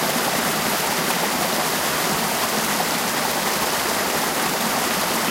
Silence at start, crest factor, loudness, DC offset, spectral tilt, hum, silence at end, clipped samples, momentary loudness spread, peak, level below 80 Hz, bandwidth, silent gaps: 0 s; 14 dB; -20 LUFS; under 0.1%; -2 dB/octave; none; 0 s; under 0.1%; 0 LU; -8 dBFS; -52 dBFS; 16 kHz; none